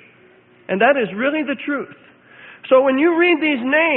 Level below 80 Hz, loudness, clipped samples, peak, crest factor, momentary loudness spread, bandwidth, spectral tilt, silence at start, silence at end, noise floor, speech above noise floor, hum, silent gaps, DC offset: -66 dBFS; -17 LUFS; under 0.1%; -2 dBFS; 18 dB; 11 LU; 4.2 kHz; -10 dB/octave; 0.7 s; 0 s; -50 dBFS; 34 dB; none; none; under 0.1%